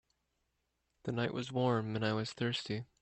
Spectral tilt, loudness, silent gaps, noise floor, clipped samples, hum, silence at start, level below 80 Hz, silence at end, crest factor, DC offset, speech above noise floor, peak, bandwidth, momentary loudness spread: -6 dB/octave; -36 LUFS; none; -82 dBFS; under 0.1%; none; 1.05 s; -72 dBFS; 0.2 s; 18 dB; under 0.1%; 47 dB; -20 dBFS; 8.4 kHz; 8 LU